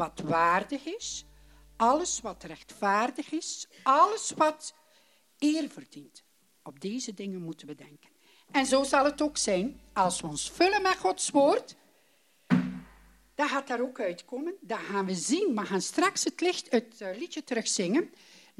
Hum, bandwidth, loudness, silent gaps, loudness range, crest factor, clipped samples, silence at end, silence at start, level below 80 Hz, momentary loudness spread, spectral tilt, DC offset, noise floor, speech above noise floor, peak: none; 14 kHz; -29 LUFS; none; 6 LU; 20 dB; under 0.1%; 0.5 s; 0 s; -62 dBFS; 15 LU; -3.5 dB/octave; under 0.1%; -67 dBFS; 38 dB; -10 dBFS